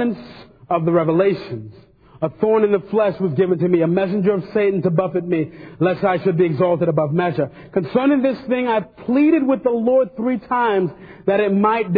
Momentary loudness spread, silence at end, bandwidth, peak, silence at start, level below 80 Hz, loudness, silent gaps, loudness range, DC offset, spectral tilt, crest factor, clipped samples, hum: 8 LU; 0 s; 5 kHz; -4 dBFS; 0 s; -56 dBFS; -18 LUFS; none; 1 LU; under 0.1%; -11 dB/octave; 14 dB; under 0.1%; none